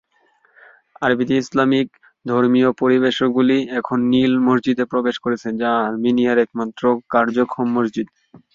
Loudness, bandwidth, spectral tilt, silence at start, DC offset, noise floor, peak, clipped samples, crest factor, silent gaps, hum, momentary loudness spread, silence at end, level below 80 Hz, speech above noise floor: -18 LUFS; 7.4 kHz; -6.5 dB/octave; 1 s; under 0.1%; -60 dBFS; -2 dBFS; under 0.1%; 16 dB; none; none; 7 LU; 0.5 s; -60 dBFS; 42 dB